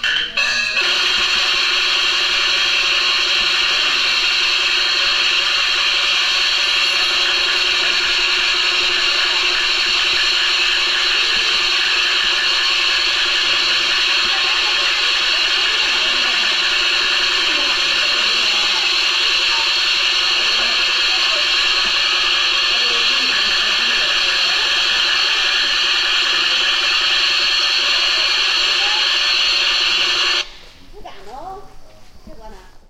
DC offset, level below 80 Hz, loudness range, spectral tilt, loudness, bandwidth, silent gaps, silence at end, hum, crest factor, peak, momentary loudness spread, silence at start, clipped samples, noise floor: under 0.1%; -44 dBFS; 0 LU; 1.5 dB/octave; -13 LUFS; 15.5 kHz; none; 0.1 s; none; 12 dB; -4 dBFS; 1 LU; 0 s; under 0.1%; -37 dBFS